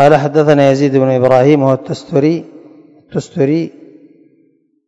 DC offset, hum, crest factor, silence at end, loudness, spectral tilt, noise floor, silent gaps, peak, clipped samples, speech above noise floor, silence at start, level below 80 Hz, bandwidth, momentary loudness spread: under 0.1%; none; 12 dB; 1.2 s; -12 LUFS; -7.5 dB/octave; -55 dBFS; none; 0 dBFS; 0.8%; 44 dB; 0 s; -54 dBFS; 8.4 kHz; 13 LU